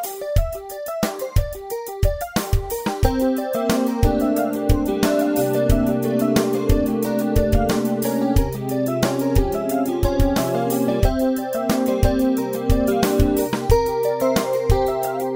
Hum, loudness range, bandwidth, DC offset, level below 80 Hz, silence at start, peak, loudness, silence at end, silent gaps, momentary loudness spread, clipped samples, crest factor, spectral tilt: none; 2 LU; 16.5 kHz; under 0.1%; -26 dBFS; 0 s; -2 dBFS; -21 LUFS; 0 s; none; 5 LU; under 0.1%; 18 dB; -6 dB/octave